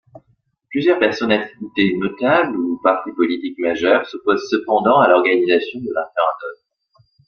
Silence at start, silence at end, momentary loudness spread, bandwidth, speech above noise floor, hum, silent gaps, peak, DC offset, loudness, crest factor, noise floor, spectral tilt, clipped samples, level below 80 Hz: 0.15 s; 0.75 s; 10 LU; 6.8 kHz; 46 dB; none; none; -2 dBFS; under 0.1%; -17 LUFS; 16 dB; -63 dBFS; -6 dB/octave; under 0.1%; -60 dBFS